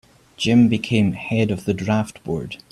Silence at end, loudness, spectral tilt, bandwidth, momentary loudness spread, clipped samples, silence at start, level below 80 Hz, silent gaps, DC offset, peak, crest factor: 0.15 s; -20 LUFS; -6.5 dB/octave; 12.5 kHz; 11 LU; under 0.1%; 0.4 s; -50 dBFS; none; under 0.1%; -4 dBFS; 16 dB